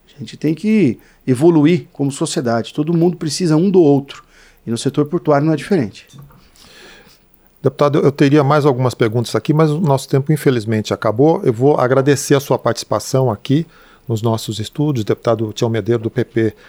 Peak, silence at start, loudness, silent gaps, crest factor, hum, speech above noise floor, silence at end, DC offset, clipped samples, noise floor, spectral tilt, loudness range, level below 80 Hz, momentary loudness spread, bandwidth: 0 dBFS; 0.2 s; -16 LUFS; none; 14 dB; none; 36 dB; 0.15 s; under 0.1%; under 0.1%; -51 dBFS; -6.5 dB/octave; 4 LU; -54 dBFS; 9 LU; over 20 kHz